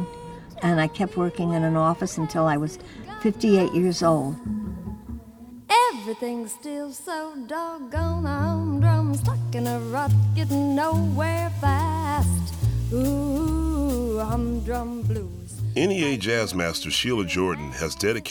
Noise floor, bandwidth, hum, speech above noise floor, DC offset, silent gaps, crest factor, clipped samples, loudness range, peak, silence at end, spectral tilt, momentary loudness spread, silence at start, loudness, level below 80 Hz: -44 dBFS; over 20 kHz; none; 20 dB; under 0.1%; none; 18 dB; under 0.1%; 3 LU; -6 dBFS; 0 s; -6 dB/octave; 11 LU; 0 s; -24 LUFS; -38 dBFS